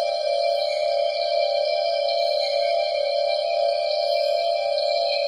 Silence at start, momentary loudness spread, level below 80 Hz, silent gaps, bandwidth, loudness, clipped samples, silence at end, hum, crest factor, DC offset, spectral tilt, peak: 0 s; 1 LU; -66 dBFS; none; 11.5 kHz; -22 LUFS; under 0.1%; 0 s; none; 10 dB; under 0.1%; 1 dB/octave; -12 dBFS